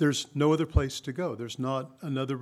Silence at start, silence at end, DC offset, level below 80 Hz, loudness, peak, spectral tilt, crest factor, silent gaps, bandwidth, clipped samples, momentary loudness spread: 0 s; 0 s; under 0.1%; -40 dBFS; -29 LUFS; -10 dBFS; -5.5 dB/octave; 18 dB; none; 14.5 kHz; under 0.1%; 8 LU